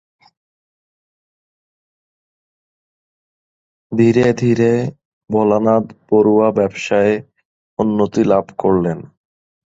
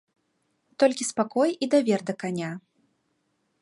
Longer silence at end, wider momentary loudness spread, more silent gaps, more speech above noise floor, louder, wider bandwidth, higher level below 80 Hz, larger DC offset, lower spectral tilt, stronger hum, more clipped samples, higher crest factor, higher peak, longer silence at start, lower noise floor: second, 0.7 s vs 1 s; about the same, 10 LU vs 10 LU; first, 5.05-5.21 s, 7.45-7.77 s vs none; first, over 76 dB vs 49 dB; first, -16 LUFS vs -25 LUFS; second, 7.8 kHz vs 11.5 kHz; first, -52 dBFS vs -78 dBFS; neither; first, -7.5 dB/octave vs -4.5 dB/octave; neither; neither; about the same, 16 dB vs 18 dB; first, -2 dBFS vs -8 dBFS; first, 3.9 s vs 0.8 s; first, under -90 dBFS vs -73 dBFS